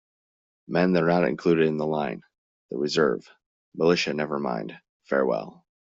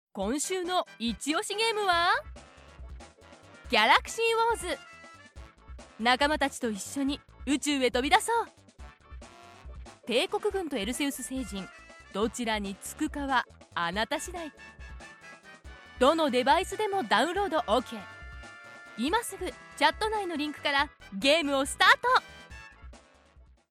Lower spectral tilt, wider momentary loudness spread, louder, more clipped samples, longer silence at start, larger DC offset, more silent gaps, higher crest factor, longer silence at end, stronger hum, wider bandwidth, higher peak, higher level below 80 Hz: first, -6 dB/octave vs -2.5 dB/octave; second, 14 LU vs 23 LU; first, -25 LUFS vs -28 LUFS; neither; first, 0.7 s vs 0.15 s; neither; first, 2.38-2.69 s, 3.46-3.72 s, 4.89-5.00 s vs none; about the same, 18 dB vs 22 dB; second, 0.45 s vs 0.75 s; neither; second, 7.8 kHz vs 16 kHz; about the same, -8 dBFS vs -8 dBFS; second, -64 dBFS vs -50 dBFS